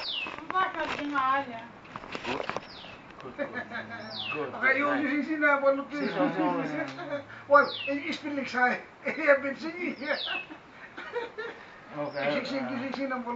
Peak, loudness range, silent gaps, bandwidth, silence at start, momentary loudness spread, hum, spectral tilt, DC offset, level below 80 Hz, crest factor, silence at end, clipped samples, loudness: -8 dBFS; 7 LU; none; 7.6 kHz; 0 s; 18 LU; none; -2 dB/octave; under 0.1%; -68 dBFS; 24 dB; 0 s; under 0.1%; -29 LUFS